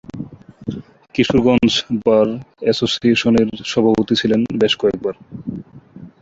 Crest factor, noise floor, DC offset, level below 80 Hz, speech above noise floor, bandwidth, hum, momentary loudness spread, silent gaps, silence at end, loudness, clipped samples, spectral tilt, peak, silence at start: 16 dB; -39 dBFS; under 0.1%; -46 dBFS; 24 dB; 7.8 kHz; none; 17 LU; none; 0.15 s; -16 LUFS; under 0.1%; -5.5 dB/octave; -2 dBFS; 0.15 s